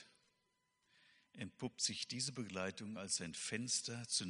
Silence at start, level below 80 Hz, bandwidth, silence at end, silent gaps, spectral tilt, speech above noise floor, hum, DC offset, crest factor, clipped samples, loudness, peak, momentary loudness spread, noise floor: 0 s; -82 dBFS; 10.5 kHz; 0 s; none; -2 dB/octave; 40 dB; none; under 0.1%; 22 dB; under 0.1%; -42 LUFS; -22 dBFS; 9 LU; -83 dBFS